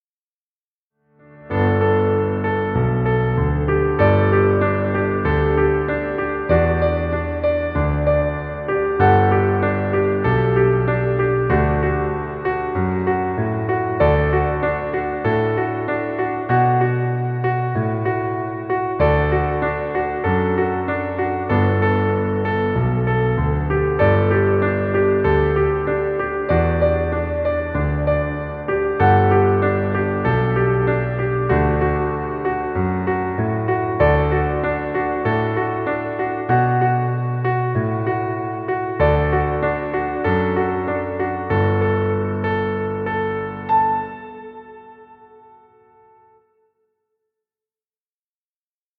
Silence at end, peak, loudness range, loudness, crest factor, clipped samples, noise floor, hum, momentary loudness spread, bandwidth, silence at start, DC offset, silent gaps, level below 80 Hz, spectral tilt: 3.85 s; -2 dBFS; 3 LU; -19 LUFS; 16 dB; under 0.1%; under -90 dBFS; none; 7 LU; 4.8 kHz; 1.35 s; under 0.1%; none; -32 dBFS; -11 dB/octave